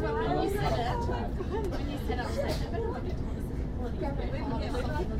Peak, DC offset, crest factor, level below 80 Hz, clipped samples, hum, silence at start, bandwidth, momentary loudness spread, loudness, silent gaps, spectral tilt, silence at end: -16 dBFS; under 0.1%; 14 dB; -36 dBFS; under 0.1%; none; 0 s; 16 kHz; 6 LU; -33 LUFS; none; -7 dB/octave; 0 s